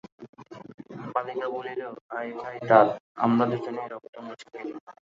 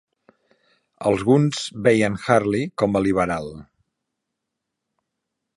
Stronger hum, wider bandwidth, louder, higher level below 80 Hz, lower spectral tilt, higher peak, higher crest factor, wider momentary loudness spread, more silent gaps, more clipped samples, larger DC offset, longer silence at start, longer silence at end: neither; second, 7.6 kHz vs 11.5 kHz; second, -26 LUFS vs -20 LUFS; second, -74 dBFS vs -52 dBFS; first, -8 dB/octave vs -6 dB/octave; about the same, -4 dBFS vs -2 dBFS; about the same, 24 dB vs 22 dB; first, 25 LU vs 7 LU; first, 0.29-0.33 s, 0.74-0.78 s, 2.01-2.09 s, 3.00-3.15 s, 4.09-4.13 s, 4.81-4.87 s vs none; neither; neither; second, 0.2 s vs 1 s; second, 0.2 s vs 1.95 s